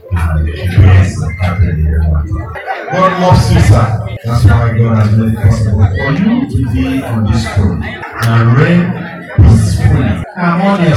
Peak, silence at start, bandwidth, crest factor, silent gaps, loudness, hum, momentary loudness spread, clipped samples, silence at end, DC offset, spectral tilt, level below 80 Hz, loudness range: 0 dBFS; 0.05 s; 12.5 kHz; 10 dB; none; -11 LUFS; none; 9 LU; 2%; 0 s; under 0.1%; -7.5 dB/octave; -20 dBFS; 2 LU